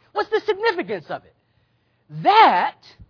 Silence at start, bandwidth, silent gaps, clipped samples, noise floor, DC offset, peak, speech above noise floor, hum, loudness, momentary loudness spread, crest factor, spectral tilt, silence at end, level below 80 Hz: 0.15 s; 5.4 kHz; none; under 0.1%; -65 dBFS; under 0.1%; 0 dBFS; 46 dB; none; -19 LUFS; 21 LU; 20 dB; -5.5 dB/octave; 0.4 s; -62 dBFS